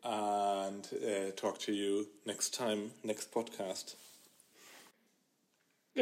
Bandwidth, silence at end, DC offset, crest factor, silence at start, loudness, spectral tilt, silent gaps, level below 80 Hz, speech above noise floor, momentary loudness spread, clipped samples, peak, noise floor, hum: 16 kHz; 0 s; under 0.1%; 22 dB; 0 s; -38 LUFS; -3 dB/octave; none; under -90 dBFS; 38 dB; 21 LU; under 0.1%; -18 dBFS; -77 dBFS; none